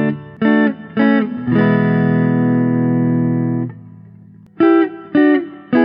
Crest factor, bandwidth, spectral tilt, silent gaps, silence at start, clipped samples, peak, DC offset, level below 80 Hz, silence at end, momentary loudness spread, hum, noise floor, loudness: 14 dB; 5.2 kHz; -11.5 dB/octave; none; 0 s; under 0.1%; -2 dBFS; under 0.1%; -60 dBFS; 0 s; 5 LU; 50 Hz at -45 dBFS; -41 dBFS; -15 LUFS